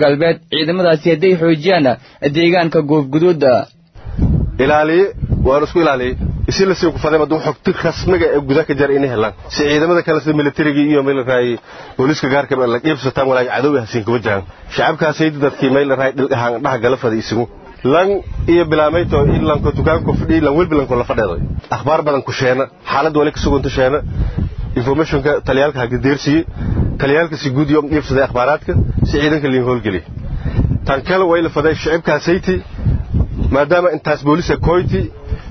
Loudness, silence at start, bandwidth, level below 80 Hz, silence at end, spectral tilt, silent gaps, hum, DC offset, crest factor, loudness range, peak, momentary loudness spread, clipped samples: -15 LUFS; 0 s; 6.4 kHz; -28 dBFS; 0 s; -7 dB/octave; none; none; under 0.1%; 14 dB; 2 LU; 0 dBFS; 7 LU; under 0.1%